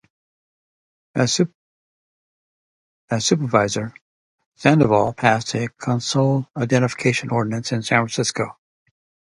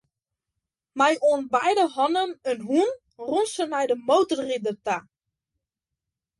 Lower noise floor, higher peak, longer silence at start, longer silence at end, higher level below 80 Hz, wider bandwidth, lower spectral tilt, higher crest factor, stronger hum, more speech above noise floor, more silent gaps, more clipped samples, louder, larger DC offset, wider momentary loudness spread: first, under -90 dBFS vs -86 dBFS; first, 0 dBFS vs -8 dBFS; first, 1.15 s vs 0.95 s; second, 0.85 s vs 1.4 s; first, -56 dBFS vs -72 dBFS; about the same, 11.5 kHz vs 11.5 kHz; first, -5 dB/octave vs -3.5 dB/octave; first, 22 dB vs 16 dB; neither; first, over 71 dB vs 63 dB; first, 1.55-3.08 s, 4.01-4.38 s, 4.46-4.52 s vs none; neither; first, -20 LUFS vs -24 LUFS; neither; about the same, 8 LU vs 8 LU